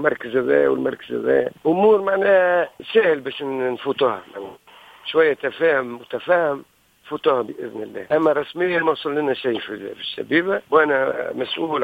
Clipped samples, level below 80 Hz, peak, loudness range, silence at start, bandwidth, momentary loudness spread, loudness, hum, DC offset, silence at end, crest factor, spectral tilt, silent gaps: under 0.1%; -64 dBFS; -2 dBFS; 4 LU; 0 s; 5 kHz; 13 LU; -20 LUFS; none; under 0.1%; 0 s; 18 dB; -6.5 dB/octave; none